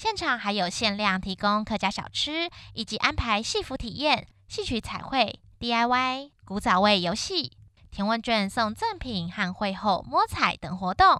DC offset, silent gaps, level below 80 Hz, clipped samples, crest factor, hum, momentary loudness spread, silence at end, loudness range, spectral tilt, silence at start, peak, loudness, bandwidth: under 0.1%; none; -46 dBFS; under 0.1%; 24 dB; none; 9 LU; 0 s; 2 LU; -4 dB/octave; 0 s; -2 dBFS; -26 LUFS; 13 kHz